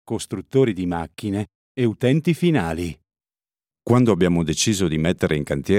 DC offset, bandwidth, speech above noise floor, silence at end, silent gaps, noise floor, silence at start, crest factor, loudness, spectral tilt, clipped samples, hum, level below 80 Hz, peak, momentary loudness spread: under 0.1%; 15.5 kHz; over 70 dB; 0 s; 1.55-1.75 s; under -90 dBFS; 0.05 s; 18 dB; -21 LUFS; -5.5 dB/octave; under 0.1%; none; -46 dBFS; -4 dBFS; 10 LU